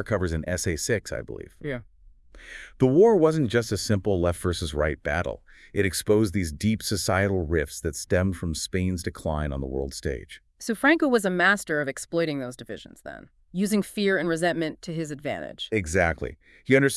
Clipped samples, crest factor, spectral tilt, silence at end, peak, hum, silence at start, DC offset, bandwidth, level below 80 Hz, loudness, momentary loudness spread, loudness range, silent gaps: under 0.1%; 20 dB; -5 dB/octave; 0 s; -6 dBFS; none; 0 s; under 0.1%; 12 kHz; -44 dBFS; -25 LUFS; 16 LU; 4 LU; none